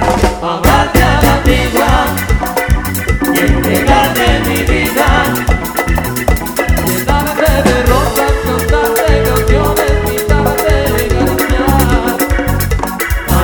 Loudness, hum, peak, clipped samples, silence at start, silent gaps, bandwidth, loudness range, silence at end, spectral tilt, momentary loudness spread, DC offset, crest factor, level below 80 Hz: -12 LUFS; none; 0 dBFS; 0.2%; 0 s; none; over 20 kHz; 1 LU; 0 s; -5 dB/octave; 5 LU; under 0.1%; 10 dB; -16 dBFS